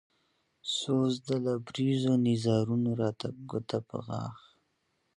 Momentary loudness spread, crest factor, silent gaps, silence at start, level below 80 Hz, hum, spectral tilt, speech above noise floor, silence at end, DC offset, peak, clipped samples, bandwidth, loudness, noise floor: 11 LU; 16 dB; none; 0.65 s; -68 dBFS; none; -6.5 dB/octave; 47 dB; 0.8 s; under 0.1%; -16 dBFS; under 0.1%; 11 kHz; -31 LUFS; -77 dBFS